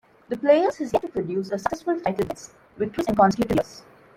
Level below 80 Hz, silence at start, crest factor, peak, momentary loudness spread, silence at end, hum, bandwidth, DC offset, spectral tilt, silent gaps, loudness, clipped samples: -52 dBFS; 0.3 s; 18 dB; -6 dBFS; 11 LU; 0.4 s; none; 16.5 kHz; under 0.1%; -6.5 dB/octave; none; -24 LUFS; under 0.1%